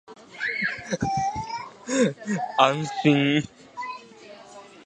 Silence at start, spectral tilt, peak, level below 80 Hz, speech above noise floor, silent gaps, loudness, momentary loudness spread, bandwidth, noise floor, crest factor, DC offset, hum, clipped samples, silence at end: 0.1 s; -5 dB/octave; -2 dBFS; -56 dBFS; 24 dB; none; -25 LUFS; 24 LU; 9.4 kHz; -46 dBFS; 24 dB; under 0.1%; none; under 0.1%; 0.05 s